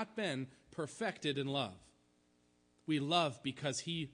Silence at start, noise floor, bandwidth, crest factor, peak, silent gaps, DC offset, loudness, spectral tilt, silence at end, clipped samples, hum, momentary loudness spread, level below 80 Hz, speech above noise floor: 0 s; -73 dBFS; 10.5 kHz; 22 dB; -18 dBFS; none; under 0.1%; -38 LUFS; -4.5 dB/octave; 0 s; under 0.1%; none; 11 LU; -76 dBFS; 35 dB